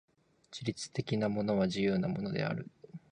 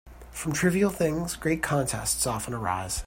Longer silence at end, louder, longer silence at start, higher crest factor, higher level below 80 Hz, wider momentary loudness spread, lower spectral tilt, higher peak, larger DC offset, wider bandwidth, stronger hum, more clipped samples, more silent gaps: first, 0.15 s vs 0 s; second, -34 LUFS vs -27 LUFS; first, 0.5 s vs 0.05 s; about the same, 16 dB vs 16 dB; second, -64 dBFS vs -46 dBFS; first, 14 LU vs 6 LU; first, -6 dB/octave vs -4.5 dB/octave; second, -18 dBFS vs -10 dBFS; neither; second, 10 kHz vs 16.5 kHz; neither; neither; neither